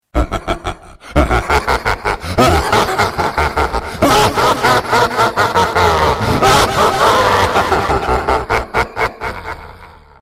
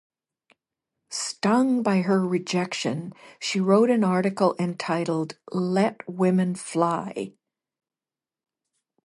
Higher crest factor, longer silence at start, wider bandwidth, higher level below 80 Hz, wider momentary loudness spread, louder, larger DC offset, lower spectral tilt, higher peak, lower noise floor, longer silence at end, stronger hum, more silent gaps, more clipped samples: about the same, 14 dB vs 18 dB; second, 0.15 s vs 1.1 s; first, 16 kHz vs 11.5 kHz; first, -26 dBFS vs -74 dBFS; about the same, 9 LU vs 11 LU; first, -14 LUFS vs -24 LUFS; neither; second, -4 dB/octave vs -5.5 dB/octave; first, 0 dBFS vs -6 dBFS; second, -39 dBFS vs under -90 dBFS; second, 0.3 s vs 1.75 s; neither; neither; neither